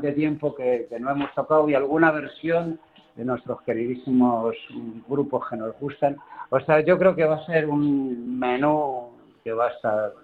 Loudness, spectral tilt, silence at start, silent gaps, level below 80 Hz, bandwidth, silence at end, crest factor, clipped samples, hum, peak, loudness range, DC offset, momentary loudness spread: -23 LUFS; -9 dB/octave; 0 s; none; -62 dBFS; 4.6 kHz; 0.1 s; 20 dB; under 0.1%; none; -4 dBFS; 4 LU; under 0.1%; 12 LU